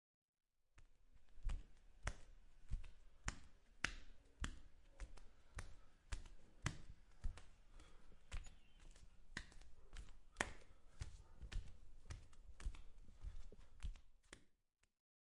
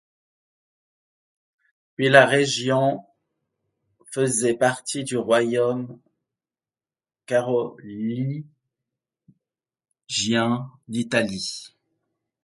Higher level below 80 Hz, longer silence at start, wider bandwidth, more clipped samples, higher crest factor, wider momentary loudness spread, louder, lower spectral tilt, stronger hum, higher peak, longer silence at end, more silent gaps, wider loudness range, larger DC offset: first, -56 dBFS vs -66 dBFS; second, 0.75 s vs 2 s; about the same, 11 kHz vs 11.5 kHz; neither; first, 34 dB vs 26 dB; first, 20 LU vs 15 LU; second, -55 LUFS vs -22 LUFS; about the same, -3.5 dB/octave vs -4 dB/octave; neither; second, -18 dBFS vs 0 dBFS; about the same, 0.7 s vs 0.75 s; neither; about the same, 6 LU vs 8 LU; neither